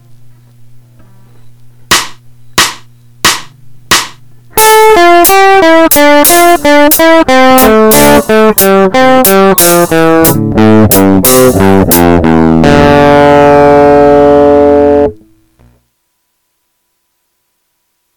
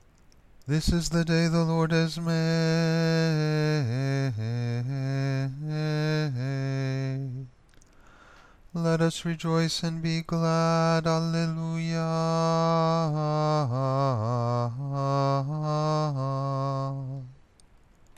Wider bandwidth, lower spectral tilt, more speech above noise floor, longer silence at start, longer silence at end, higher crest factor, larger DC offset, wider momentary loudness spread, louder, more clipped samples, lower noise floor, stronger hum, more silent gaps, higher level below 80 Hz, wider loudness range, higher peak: first, over 20 kHz vs 12.5 kHz; second, -4 dB/octave vs -6.5 dB/octave; first, 57 dB vs 31 dB; second, 0 s vs 0.6 s; second, 0 s vs 0.85 s; second, 6 dB vs 16 dB; neither; about the same, 6 LU vs 7 LU; first, -4 LUFS vs -27 LUFS; first, 7% vs under 0.1%; first, -61 dBFS vs -57 dBFS; neither; neither; first, -30 dBFS vs -48 dBFS; first, 9 LU vs 5 LU; first, 0 dBFS vs -12 dBFS